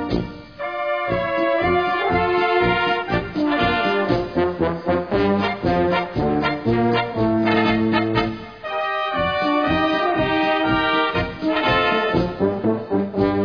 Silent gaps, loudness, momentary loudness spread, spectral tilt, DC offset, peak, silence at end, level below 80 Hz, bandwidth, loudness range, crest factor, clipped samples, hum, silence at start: none; -20 LUFS; 5 LU; -7.5 dB/octave; 0.2%; -4 dBFS; 0 s; -40 dBFS; 5.4 kHz; 1 LU; 16 dB; under 0.1%; none; 0 s